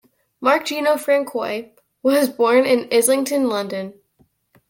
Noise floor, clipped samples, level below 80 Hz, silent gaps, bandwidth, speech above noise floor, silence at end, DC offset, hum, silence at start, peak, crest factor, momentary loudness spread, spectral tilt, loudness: -61 dBFS; under 0.1%; -68 dBFS; none; 17 kHz; 43 dB; 0.8 s; under 0.1%; none; 0.4 s; -2 dBFS; 16 dB; 11 LU; -3 dB/octave; -19 LUFS